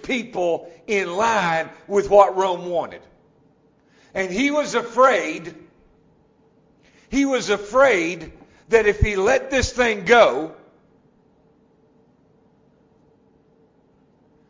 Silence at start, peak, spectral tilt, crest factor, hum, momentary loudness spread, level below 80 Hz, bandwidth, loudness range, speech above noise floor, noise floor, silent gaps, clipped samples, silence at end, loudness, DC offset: 0.05 s; -2 dBFS; -4.5 dB/octave; 20 dB; none; 14 LU; -40 dBFS; 7.6 kHz; 4 LU; 39 dB; -58 dBFS; none; under 0.1%; 3.95 s; -19 LUFS; under 0.1%